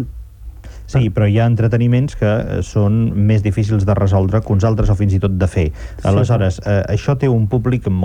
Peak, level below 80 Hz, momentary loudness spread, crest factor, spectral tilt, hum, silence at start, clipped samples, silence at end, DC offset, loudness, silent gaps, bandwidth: -4 dBFS; -30 dBFS; 6 LU; 12 dB; -8.5 dB/octave; none; 0 s; under 0.1%; 0 s; under 0.1%; -16 LUFS; none; 9.4 kHz